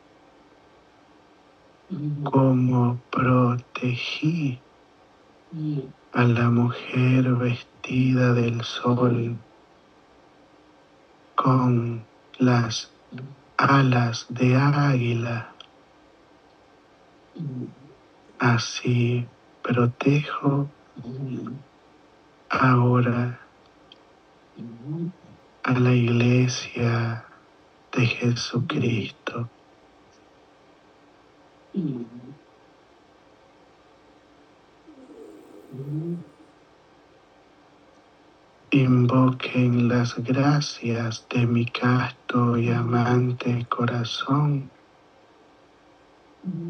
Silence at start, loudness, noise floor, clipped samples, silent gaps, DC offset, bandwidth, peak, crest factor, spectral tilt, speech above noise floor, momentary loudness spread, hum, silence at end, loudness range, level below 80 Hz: 1.9 s; -23 LUFS; -55 dBFS; under 0.1%; none; under 0.1%; 6.6 kHz; -6 dBFS; 20 dB; -7 dB/octave; 33 dB; 17 LU; none; 0 s; 16 LU; -64 dBFS